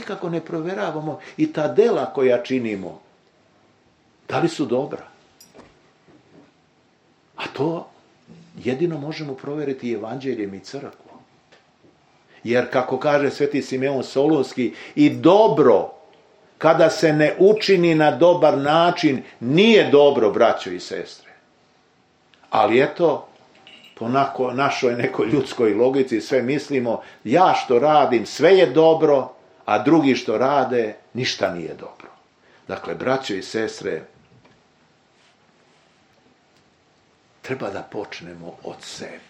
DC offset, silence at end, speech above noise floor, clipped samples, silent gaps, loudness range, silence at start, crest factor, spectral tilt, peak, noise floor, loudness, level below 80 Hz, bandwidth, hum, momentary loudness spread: under 0.1%; 0.1 s; 40 dB; under 0.1%; none; 15 LU; 0 s; 20 dB; -6 dB/octave; 0 dBFS; -59 dBFS; -19 LUFS; -68 dBFS; 9.6 kHz; none; 17 LU